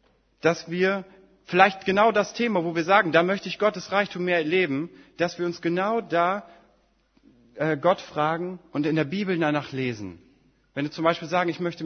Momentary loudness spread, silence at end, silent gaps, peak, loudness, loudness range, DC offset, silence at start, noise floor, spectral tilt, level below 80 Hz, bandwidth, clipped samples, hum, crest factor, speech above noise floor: 11 LU; 0 s; none; 0 dBFS; -24 LUFS; 5 LU; under 0.1%; 0.45 s; -64 dBFS; -5.5 dB/octave; -66 dBFS; 6.6 kHz; under 0.1%; none; 24 dB; 40 dB